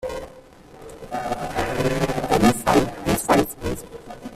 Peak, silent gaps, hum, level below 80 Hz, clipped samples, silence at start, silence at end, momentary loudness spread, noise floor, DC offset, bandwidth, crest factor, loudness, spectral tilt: -4 dBFS; none; none; -40 dBFS; under 0.1%; 0 s; 0 s; 20 LU; -45 dBFS; under 0.1%; 16 kHz; 20 dB; -22 LUFS; -5 dB/octave